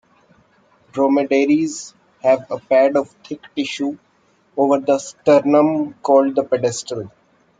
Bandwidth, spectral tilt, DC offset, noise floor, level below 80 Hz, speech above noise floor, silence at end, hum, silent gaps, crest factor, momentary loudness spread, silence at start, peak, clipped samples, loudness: 9.4 kHz; -5 dB/octave; under 0.1%; -58 dBFS; -66 dBFS; 42 dB; 0.5 s; none; none; 16 dB; 16 LU; 0.95 s; -2 dBFS; under 0.1%; -18 LUFS